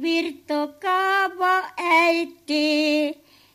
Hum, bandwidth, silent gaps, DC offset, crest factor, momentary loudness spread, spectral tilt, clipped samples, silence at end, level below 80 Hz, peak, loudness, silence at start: 50 Hz at -70 dBFS; 15 kHz; none; under 0.1%; 16 dB; 9 LU; -2 dB/octave; under 0.1%; 0.4 s; -74 dBFS; -6 dBFS; -21 LUFS; 0 s